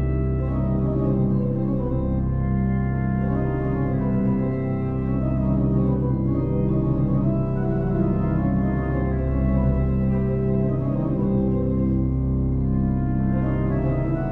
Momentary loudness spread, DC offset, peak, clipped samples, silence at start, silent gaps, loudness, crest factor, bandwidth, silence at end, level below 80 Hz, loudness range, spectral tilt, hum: 3 LU; under 0.1%; -10 dBFS; under 0.1%; 0 s; none; -23 LUFS; 12 dB; 2.9 kHz; 0 s; -30 dBFS; 1 LU; -12.5 dB/octave; none